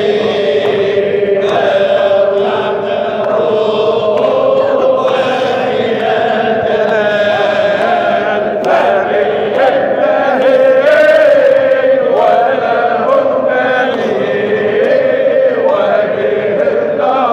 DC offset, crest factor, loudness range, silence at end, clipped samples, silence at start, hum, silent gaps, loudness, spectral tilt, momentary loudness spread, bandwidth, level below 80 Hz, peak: under 0.1%; 10 dB; 3 LU; 0 s; under 0.1%; 0 s; none; none; -11 LUFS; -5.5 dB/octave; 5 LU; 8.4 kHz; -56 dBFS; 0 dBFS